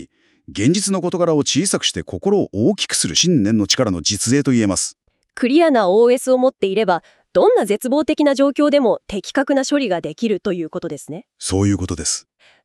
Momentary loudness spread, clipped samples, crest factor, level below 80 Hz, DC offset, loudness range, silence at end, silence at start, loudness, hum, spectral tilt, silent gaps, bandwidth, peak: 9 LU; under 0.1%; 14 dB; -48 dBFS; under 0.1%; 4 LU; 0.45 s; 0 s; -17 LUFS; none; -4 dB/octave; none; 13.5 kHz; -2 dBFS